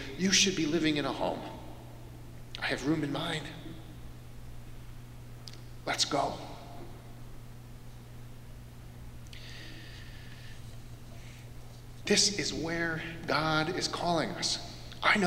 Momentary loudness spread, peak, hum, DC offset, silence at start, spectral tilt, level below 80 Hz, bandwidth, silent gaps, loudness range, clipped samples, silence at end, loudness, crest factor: 22 LU; -10 dBFS; none; under 0.1%; 0 s; -3 dB/octave; -50 dBFS; 16 kHz; none; 18 LU; under 0.1%; 0 s; -30 LUFS; 24 dB